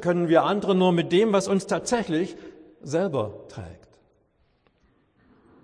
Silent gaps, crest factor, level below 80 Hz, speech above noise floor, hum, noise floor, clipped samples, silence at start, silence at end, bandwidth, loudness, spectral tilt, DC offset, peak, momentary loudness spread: none; 20 dB; -60 dBFS; 43 dB; none; -66 dBFS; under 0.1%; 0 s; 1.9 s; 10.5 kHz; -23 LUFS; -6 dB/octave; under 0.1%; -6 dBFS; 20 LU